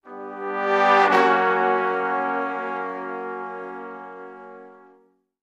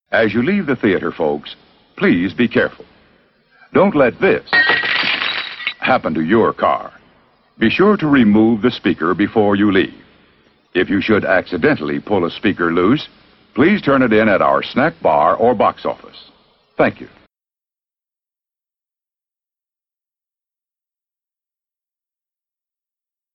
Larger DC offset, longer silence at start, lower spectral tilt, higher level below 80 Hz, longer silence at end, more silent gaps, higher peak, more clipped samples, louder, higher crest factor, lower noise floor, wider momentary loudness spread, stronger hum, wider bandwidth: neither; about the same, 0.05 s vs 0.1 s; second, -5 dB/octave vs -8 dB/octave; second, -80 dBFS vs -50 dBFS; second, 0.65 s vs 6.3 s; neither; about the same, -2 dBFS vs -2 dBFS; neither; second, -21 LUFS vs -15 LUFS; first, 22 dB vs 16 dB; second, -60 dBFS vs under -90 dBFS; first, 22 LU vs 8 LU; neither; first, 10 kHz vs 6 kHz